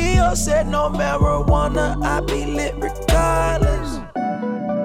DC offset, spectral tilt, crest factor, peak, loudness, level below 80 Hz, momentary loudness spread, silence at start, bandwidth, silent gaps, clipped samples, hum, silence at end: under 0.1%; -5.5 dB/octave; 14 dB; -4 dBFS; -20 LUFS; -24 dBFS; 7 LU; 0 s; 15.5 kHz; none; under 0.1%; none; 0 s